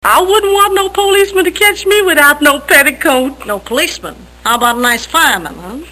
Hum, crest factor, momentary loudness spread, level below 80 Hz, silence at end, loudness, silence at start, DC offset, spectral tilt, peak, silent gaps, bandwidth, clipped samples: 60 Hz at -40 dBFS; 10 dB; 12 LU; -38 dBFS; 0 s; -10 LUFS; 0.05 s; 0.1%; -1.5 dB/octave; 0 dBFS; none; over 20 kHz; 0.6%